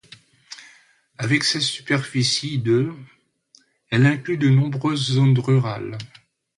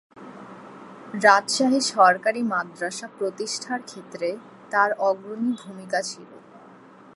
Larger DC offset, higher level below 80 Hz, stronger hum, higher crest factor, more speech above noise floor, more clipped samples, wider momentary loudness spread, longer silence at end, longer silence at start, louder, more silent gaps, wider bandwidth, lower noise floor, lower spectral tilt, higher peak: neither; first, -60 dBFS vs -78 dBFS; neither; second, 18 dB vs 24 dB; first, 38 dB vs 25 dB; neither; second, 22 LU vs 25 LU; second, 0.5 s vs 0.75 s; first, 0.5 s vs 0.15 s; first, -20 LUFS vs -23 LUFS; neither; about the same, 11.5 kHz vs 11.5 kHz; first, -58 dBFS vs -48 dBFS; first, -5.5 dB/octave vs -3 dB/octave; about the same, -4 dBFS vs -2 dBFS